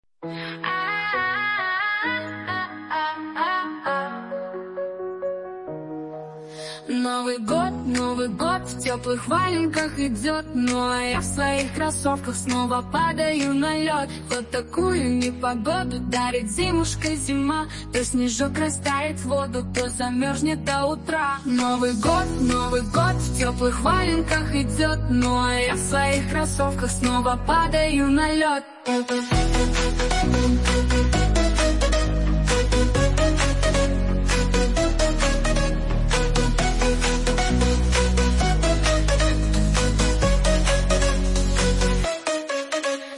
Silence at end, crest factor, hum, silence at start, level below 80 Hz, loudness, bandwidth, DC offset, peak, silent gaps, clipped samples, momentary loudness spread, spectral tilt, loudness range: 0 s; 14 dB; none; 0.2 s; -26 dBFS; -23 LUFS; 11.5 kHz; under 0.1%; -6 dBFS; none; under 0.1%; 7 LU; -4.5 dB/octave; 5 LU